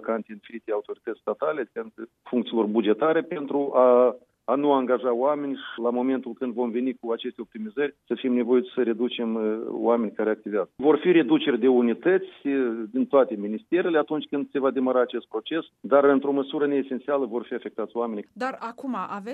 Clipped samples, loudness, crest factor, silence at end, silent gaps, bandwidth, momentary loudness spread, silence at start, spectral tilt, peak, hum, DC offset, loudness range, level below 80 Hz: under 0.1%; -25 LUFS; 18 dB; 0 s; none; 4.8 kHz; 11 LU; 0 s; -8 dB/octave; -6 dBFS; none; under 0.1%; 4 LU; -80 dBFS